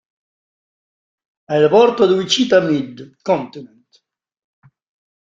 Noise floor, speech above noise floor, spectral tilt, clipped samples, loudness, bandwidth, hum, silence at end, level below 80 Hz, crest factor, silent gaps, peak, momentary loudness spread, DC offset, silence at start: -60 dBFS; 45 dB; -4.5 dB/octave; under 0.1%; -15 LUFS; 7.8 kHz; none; 1.7 s; -62 dBFS; 18 dB; none; -2 dBFS; 16 LU; under 0.1%; 1.5 s